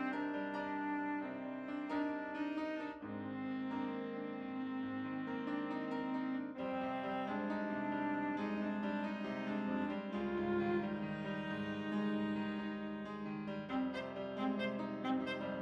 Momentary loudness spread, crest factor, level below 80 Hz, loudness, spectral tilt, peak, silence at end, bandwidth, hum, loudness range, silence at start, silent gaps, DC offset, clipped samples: 5 LU; 16 dB; -72 dBFS; -40 LUFS; -7.5 dB/octave; -24 dBFS; 0 s; 7.6 kHz; none; 3 LU; 0 s; none; under 0.1%; under 0.1%